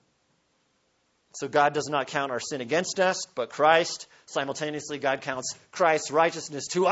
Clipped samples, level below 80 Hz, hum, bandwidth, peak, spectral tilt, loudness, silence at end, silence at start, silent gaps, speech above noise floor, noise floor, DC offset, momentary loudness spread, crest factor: under 0.1%; -72 dBFS; none; 8.2 kHz; -6 dBFS; -3 dB/octave; -26 LUFS; 0 s; 1.35 s; none; 44 dB; -71 dBFS; under 0.1%; 11 LU; 22 dB